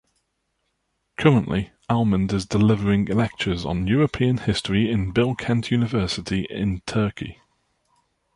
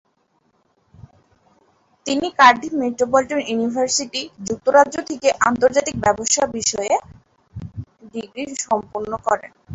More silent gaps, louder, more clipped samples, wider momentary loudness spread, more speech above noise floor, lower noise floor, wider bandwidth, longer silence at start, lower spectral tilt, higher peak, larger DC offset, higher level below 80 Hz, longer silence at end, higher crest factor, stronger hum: neither; second, -22 LUFS vs -19 LUFS; neither; second, 8 LU vs 19 LU; first, 52 dB vs 45 dB; first, -74 dBFS vs -64 dBFS; first, 11 kHz vs 8 kHz; second, 1.2 s vs 2.05 s; first, -6.5 dB/octave vs -2.5 dB/octave; about the same, -2 dBFS vs 0 dBFS; neither; first, -42 dBFS vs -52 dBFS; first, 1 s vs 0 s; about the same, 20 dB vs 20 dB; neither